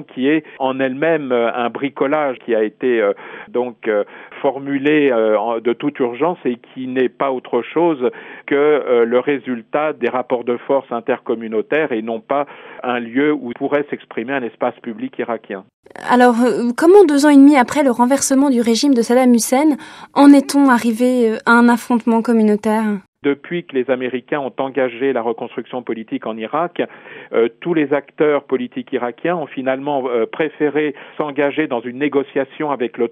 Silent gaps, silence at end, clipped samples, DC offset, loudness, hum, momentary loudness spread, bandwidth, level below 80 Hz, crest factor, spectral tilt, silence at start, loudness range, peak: 15.73-15.83 s, 23.08-23.13 s; 0 s; under 0.1%; under 0.1%; -17 LUFS; none; 12 LU; 14.5 kHz; -68 dBFS; 16 dB; -5 dB/octave; 0 s; 9 LU; 0 dBFS